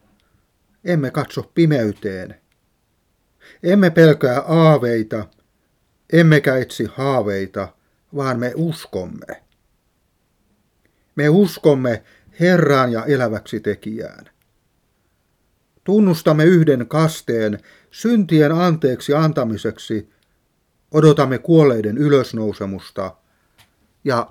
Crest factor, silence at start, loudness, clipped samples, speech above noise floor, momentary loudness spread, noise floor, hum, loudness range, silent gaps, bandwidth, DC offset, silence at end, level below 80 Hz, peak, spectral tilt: 18 dB; 0.85 s; -17 LUFS; under 0.1%; 49 dB; 16 LU; -65 dBFS; none; 7 LU; none; 15.5 kHz; under 0.1%; 0.05 s; -58 dBFS; 0 dBFS; -7.5 dB/octave